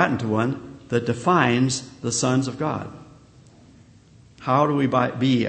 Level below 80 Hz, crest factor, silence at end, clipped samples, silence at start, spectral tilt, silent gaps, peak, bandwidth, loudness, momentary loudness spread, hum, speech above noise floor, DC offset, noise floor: -58 dBFS; 20 dB; 0 s; under 0.1%; 0 s; -5 dB/octave; none; -2 dBFS; 8.8 kHz; -22 LUFS; 9 LU; none; 29 dB; under 0.1%; -51 dBFS